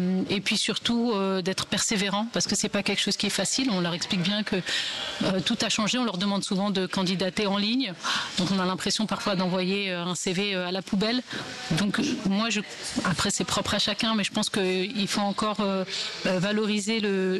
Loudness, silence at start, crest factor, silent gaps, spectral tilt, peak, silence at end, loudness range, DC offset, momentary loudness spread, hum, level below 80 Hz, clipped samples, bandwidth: -26 LUFS; 0 s; 10 dB; none; -3.5 dB/octave; -16 dBFS; 0 s; 2 LU; under 0.1%; 3 LU; none; -58 dBFS; under 0.1%; 12 kHz